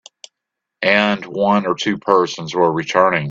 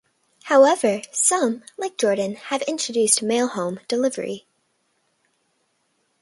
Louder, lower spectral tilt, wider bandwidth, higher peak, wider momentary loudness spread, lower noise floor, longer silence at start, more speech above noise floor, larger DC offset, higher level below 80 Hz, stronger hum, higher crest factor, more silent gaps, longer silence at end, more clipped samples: first, -17 LUFS vs -21 LUFS; first, -5 dB/octave vs -2.5 dB/octave; second, 7.8 kHz vs 11.5 kHz; about the same, 0 dBFS vs -2 dBFS; second, 5 LU vs 14 LU; first, -81 dBFS vs -69 dBFS; first, 0.8 s vs 0.45 s; first, 64 dB vs 48 dB; neither; first, -58 dBFS vs -74 dBFS; neither; about the same, 18 dB vs 22 dB; neither; second, 0 s vs 1.85 s; neither